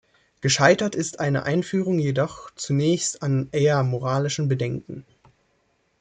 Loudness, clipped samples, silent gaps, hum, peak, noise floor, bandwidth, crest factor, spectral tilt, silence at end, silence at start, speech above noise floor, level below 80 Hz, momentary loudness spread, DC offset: -23 LUFS; under 0.1%; none; none; -2 dBFS; -68 dBFS; 9.4 kHz; 20 dB; -5 dB/octave; 1 s; 0.45 s; 45 dB; -58 dBFS; 10 LU; under 0.1%